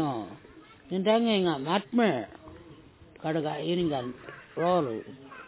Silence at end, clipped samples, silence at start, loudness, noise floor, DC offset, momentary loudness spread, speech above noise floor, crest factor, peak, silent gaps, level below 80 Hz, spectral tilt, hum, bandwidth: 0 s; under 0.1%; 0 s; -28 LUFS; -52 dBFS; under 0.1%; 19 LU; 25 dB; 18 dB; -12 dBFS; none; -62 dBFS; -4.5 dB/octave; none; 4 kHz